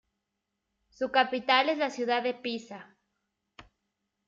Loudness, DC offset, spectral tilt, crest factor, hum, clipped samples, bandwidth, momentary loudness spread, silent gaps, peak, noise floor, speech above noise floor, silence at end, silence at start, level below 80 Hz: -28 LUFS; under 0.1%; -3 dB/octave; 22 dB; none; under 0.1%; 7.8 kHz; 14 LU; none; -10 dBFS; -84 dBFS; 55 dB; 0.65 s; 1 s; -74 dBFS